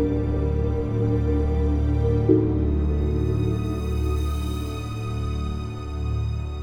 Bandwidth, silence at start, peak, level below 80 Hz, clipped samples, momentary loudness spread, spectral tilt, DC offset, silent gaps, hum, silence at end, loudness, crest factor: 9.8 kHz; 0 s; -6 dBFS; -26 dBFS; under 0.1%; 9 LU; -8.5 dB/octave; under 0.1%; none; none; 0 s; -24 LUFS; 18 dB